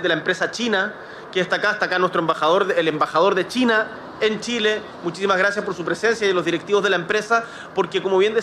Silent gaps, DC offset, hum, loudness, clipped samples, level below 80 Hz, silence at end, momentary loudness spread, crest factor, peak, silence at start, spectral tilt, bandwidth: none; under 0.1%; none; -20 LUFS; under 0.1%; -62 dBFS; 0 s; 7 LU; 16 dB; -6 dBFS; 0 s; -4 dB/octave; 12.5 kHz